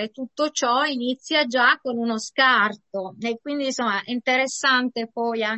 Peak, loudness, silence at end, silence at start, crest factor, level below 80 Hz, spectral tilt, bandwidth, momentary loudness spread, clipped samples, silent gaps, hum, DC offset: -6 dBFS; -22 LUFS; 0 s; 0 s; 18 dB; -74 dBFS; -2 dB/octave; 8.6 kHz; 11 LU; under 0.1%; none; none; under 0.1%